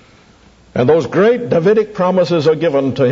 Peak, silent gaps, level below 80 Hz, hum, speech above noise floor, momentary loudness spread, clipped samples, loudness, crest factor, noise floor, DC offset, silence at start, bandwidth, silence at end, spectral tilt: -2 dBFS; none; -52 dBFS; none; 34 dB; 3 LU; under 0.1%; -14 LUFS; 12 dB; -46 dBFS; under 0.1%; 0.75 s; 7.6 kHz; 0 s; -7.5 dB/octave